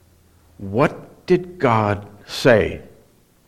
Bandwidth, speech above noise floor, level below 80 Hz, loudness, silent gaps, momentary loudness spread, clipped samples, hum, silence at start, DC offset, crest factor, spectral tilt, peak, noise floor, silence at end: 15.5 kHz; 36 dB; -48 dBFS; -19 LUFS; none; 18 LU; under 0.1%; none; 0.6 s; under 0.1%; 18 dB; -6.5 dB/octave; -2 dBFS; -54 dBFS; 0.6 s